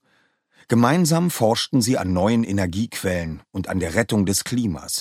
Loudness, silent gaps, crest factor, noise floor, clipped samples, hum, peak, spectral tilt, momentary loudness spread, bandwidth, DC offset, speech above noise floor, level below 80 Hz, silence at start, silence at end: -21 LUFS; none; 18 dB; -64 dBFS; under 0.1%; none; -2 dBFS; -5 dB/octave; 7 LU; 16 kHz; under 0.1%; 43 dB; -48 dBFS; 0.7 s; 0 s